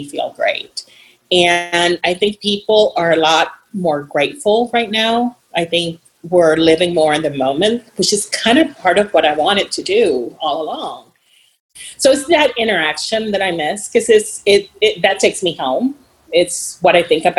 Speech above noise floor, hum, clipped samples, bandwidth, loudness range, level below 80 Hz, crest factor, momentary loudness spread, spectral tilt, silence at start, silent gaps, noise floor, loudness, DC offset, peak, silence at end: 40 dB; none; under 0.1%; 13 kHz; 3 LU; -52 dBFS; 16 dB; 8 LU; -3 dB/octave; 0 s; 11.60-11.69 s; -54 dBFS; -15 LUFS; under 0.1%; 0 dBFS; 0 s